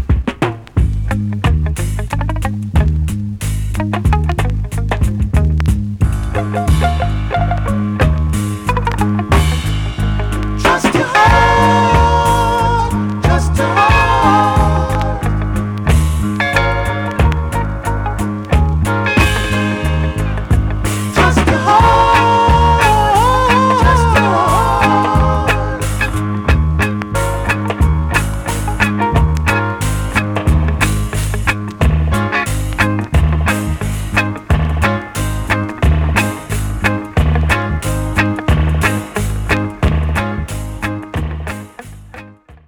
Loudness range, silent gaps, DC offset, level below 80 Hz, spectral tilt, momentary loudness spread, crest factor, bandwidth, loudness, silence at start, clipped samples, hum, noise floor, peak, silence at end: 6 LU; none; under 0.1%; -20 dBFS; -6 dB/octave; 9 LU; 12 dB; 19.5 kHz; -14 LUFS; 0 s; under 0.1%; none; -37 dBFS; -2 dBFS; 0.1 s